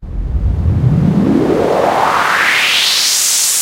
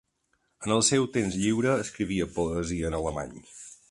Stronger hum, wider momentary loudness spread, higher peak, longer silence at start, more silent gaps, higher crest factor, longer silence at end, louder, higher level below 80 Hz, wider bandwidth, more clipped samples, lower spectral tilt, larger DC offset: neither; second, 7 LU vs 17 LU; first, 0 dBFS vs -10 dBFS; second, 0 s vs 0.6 s; neither; second, 12 dB vs 18 dB; second, 0 s vs 0.15 s; first, -11 LUFS vs -27 LUFS; first, -24 dBFS vs -48 dBFS; first, 16 kHz vs 11.5 kHz; neither; second, -3 dB/octave vs -4.5 dB/octave; neither